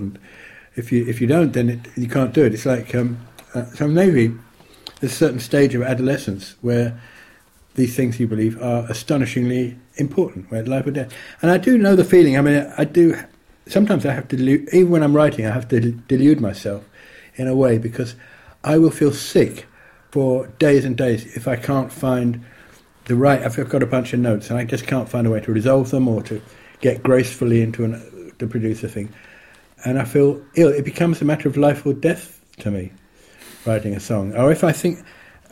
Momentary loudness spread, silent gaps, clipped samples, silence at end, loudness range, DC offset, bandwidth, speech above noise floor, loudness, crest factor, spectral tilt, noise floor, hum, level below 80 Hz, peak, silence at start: 14 LU; none; under 0.1%; 0.5 s; 5 LU; under 0.1%; 16.5 kHz; 34 dB; -18 LUFS; 16 dB; -7 dB/octave; -51 dBFS; none; -52 dBFS; -2 dBFS; 0 s